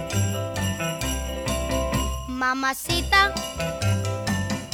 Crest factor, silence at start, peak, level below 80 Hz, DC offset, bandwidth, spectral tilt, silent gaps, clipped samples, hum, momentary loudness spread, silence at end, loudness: 20 dB; 0 s; -4 dBFS; -34 dBFS; under 0.1%; 19 kHz; -4 dB/octave; none; under 0.1%; none; 9 LU; 0 s; -24 LUFS